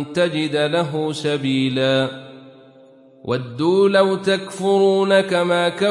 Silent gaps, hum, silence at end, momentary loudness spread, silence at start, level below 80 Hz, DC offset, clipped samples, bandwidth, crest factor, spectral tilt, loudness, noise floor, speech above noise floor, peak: none; none; 0 s; 10 LU; 0 s; -66 dBFS; under 0.1%; under 0.1%; 11.5 kHz; 14 dB; -5.5 dB/octave; -18 LUFS; -48 dBFS; 30 dB; -4 dBFS